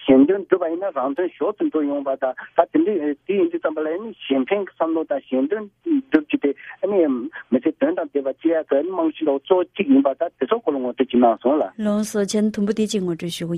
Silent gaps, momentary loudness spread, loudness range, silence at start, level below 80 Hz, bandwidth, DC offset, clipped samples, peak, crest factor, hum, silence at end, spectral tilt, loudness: none; 7 LU; 3 LU; 0 s; -62 dBFS; 14 kHz; under 0.1%; under 0.1%; 0 dBFS; 20 dB; none; 0 s; -6 dB/octave; -21 LUFS